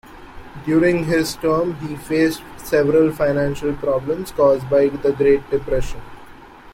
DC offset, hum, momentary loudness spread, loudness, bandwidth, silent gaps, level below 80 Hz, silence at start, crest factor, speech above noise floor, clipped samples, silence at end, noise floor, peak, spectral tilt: under 0.1%; none; 10 LU; -19 LUFS; 16.5 kHz; none; -38 dBFS; 0.1 s; 14 dB; 23 dB; under 0.1%; 0.05 s; -41 dBFS; -4 dBFS; -6.5 dB/octave